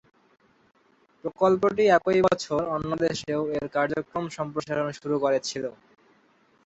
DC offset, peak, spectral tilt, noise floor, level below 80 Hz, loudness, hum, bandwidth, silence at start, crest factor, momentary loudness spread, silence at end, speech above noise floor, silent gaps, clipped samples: under 0.1%; -8 dBFS; -5.5 dB/octave; -63 dBFS; -60 dBFS; -25 LUFS; none; 8.2 kHz; 1.25 s; 18 dB; 12 LU; 0.95 s; 38 dB; none; under 0.1%